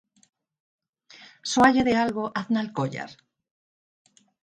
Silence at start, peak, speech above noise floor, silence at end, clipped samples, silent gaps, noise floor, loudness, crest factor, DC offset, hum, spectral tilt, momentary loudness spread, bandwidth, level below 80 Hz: 1.2 s; -4 dBFS; 29 dB; 1.3 s; under 0.1%; none; -52 dBFS; -23 LUFS; 22 dB; under 0.1%; none; -4.5 dB/octave; 17 LU; 11 kHz; -58 dBFS